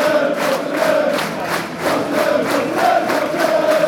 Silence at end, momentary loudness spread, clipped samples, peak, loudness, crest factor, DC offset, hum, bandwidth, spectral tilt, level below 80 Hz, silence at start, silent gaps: 0 s; 5 LU; under 0.1%; -2 dBFS; -17 LUFS; 14 dB; under 0.1%; none; 19 kHz; -4 dB/octave; -58 dBFS; 0 s; none